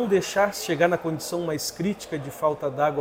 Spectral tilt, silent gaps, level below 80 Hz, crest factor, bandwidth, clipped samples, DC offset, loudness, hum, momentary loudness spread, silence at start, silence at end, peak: -4.5 dB/octave; none; -60 dBFS; 20 dB; 16.5 kHz; under 0.1%; under 0.1%; -25 LUFS; none; 6 LU; 0 s; 0 s; -6 dBFS